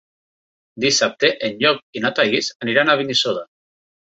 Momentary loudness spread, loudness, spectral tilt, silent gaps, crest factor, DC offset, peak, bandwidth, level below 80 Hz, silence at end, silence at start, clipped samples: 6 LU; -18 LUFS; -2.5 dB/octave; 1.83-1.93 s, 2.55-2.60 s; 20 dB; under 0.1%; 0 dBFS; 8.4 kHz; -62 dBFS; 0.7 s; 0.75 s; under 0.1%